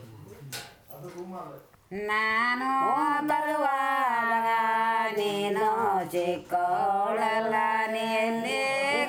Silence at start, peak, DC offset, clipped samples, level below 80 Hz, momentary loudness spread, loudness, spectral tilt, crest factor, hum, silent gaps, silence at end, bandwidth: 0 s; -14 dBFS; under 0.1%; under 0.1%; -70 dBFS; 15 LU; -26 LUFS; -4 dB/octave; 12 dB; none; none; 0 s; over 20 kHz